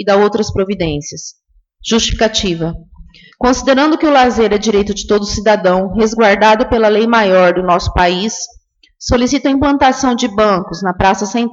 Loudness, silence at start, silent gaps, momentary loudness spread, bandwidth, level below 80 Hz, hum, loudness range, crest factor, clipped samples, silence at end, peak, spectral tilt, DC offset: -12 LUFS; 0 s; none; 10 LU; 8 kHz; -32 dBFS; none; 4 LU; 12 dB; under 0.1%; 0 s; 0 dBFS; -4.5 dB/octave; under 0.1%